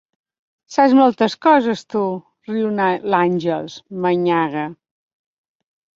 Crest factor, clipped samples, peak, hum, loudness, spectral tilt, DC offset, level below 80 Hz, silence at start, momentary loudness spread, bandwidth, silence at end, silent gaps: 18 dB; under 0.1%; -2 dBFS; none; -18 LUFS; -6.5 dB/octave; under 0.1%; -64 dBFS; 0.7 s; 13 LU; 7.6 kHz; 1.25 s; none